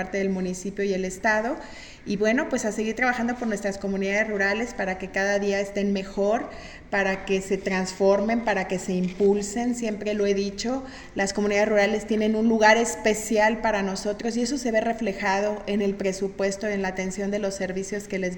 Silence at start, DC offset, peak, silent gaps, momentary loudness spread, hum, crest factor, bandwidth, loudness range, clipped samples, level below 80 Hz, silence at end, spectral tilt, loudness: 0 s; under 0.1%; -4 dBFS; none; 7 LU; none; 20 dB; 17 kHz; 4 LU; under 0.1%; -50 dBFS; 0 s; -4.5 dB/octave; -25 LUFS